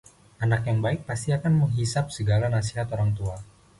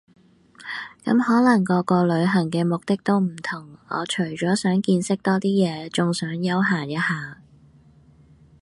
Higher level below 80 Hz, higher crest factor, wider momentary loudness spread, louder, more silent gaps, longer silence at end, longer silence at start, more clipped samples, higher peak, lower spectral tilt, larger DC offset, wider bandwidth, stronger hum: first, -46 dBFS vs -64 dBFS; about the same, 12 dB vs 16 dB; second, 7 LU vs 12 LU; second, -26 LUFS vs -22 LUFS; neither; second, 0.35 s vs 1.3 s; second, 0.4 s vs 0.6 s; neither; second, -12 dBFS vs -6 dBFS; about the same, -6.5 dB/octave vs -6 dB/octave; neither; about the same, 11.5 kHz vs 11.5 kHz; neither